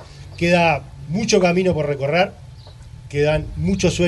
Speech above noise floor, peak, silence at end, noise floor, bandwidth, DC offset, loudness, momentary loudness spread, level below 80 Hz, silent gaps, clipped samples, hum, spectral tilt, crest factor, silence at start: 21 dB; -2 dBFS; 0 s; -39 dBFS; 11.5 kHz; under 0.1%; -19 LUFS; 9 LU; -38 dBFS; none; under 0.1%; none; -5.5 dB/octave; 16 dB; 0 s